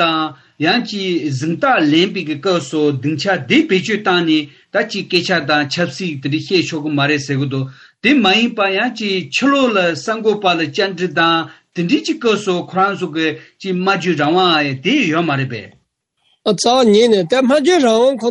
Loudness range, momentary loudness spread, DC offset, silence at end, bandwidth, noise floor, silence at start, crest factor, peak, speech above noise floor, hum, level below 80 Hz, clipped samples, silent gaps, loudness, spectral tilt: 2 LU; 8 LU; under 0.1%; 0 s; 11 kHz; -64 dBFS; 0 s; 14 dB; -2 dBFS; 49 dB; none; -62 dBFS; under 0.1%; none; -15 LUFS; -5 dB/octave